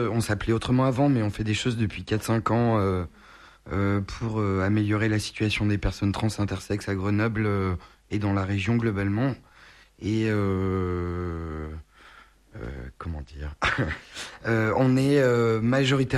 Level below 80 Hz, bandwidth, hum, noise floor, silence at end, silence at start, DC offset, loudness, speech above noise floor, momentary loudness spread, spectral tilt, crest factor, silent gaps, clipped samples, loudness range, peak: -44 dBFS; 13 kHz; none; -53 dBFS; 0 s; 0 s; under 0.1%; -25 LUFS; 28 dB; 14 LU; -6.5 dB/octave; 16 dB; none; under 0.1%; 6 LU; -10 dBFS